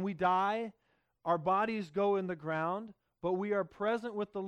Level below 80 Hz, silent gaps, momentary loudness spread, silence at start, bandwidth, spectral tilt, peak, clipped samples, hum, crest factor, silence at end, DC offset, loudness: -72 dBFS; none; 10 LU; 0 s; 9.6 kHz; -7.5 dB/octave; -18 dBFS; under 0.1%; none; 16 dB; 0 s; under 0.1%; -34 LUFS